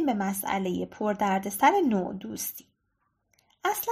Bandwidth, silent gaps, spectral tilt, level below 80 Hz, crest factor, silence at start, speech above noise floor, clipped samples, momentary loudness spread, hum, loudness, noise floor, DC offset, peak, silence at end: 15.5 kHz; none; -4.5 dB/octave; -64 dBFS; 20 dB; 0 s; 49 dB; under 0.1%; 12 LU; none; -27 LUFS; -76 dBFS; under 0.1%; -8 dBFS; 0 s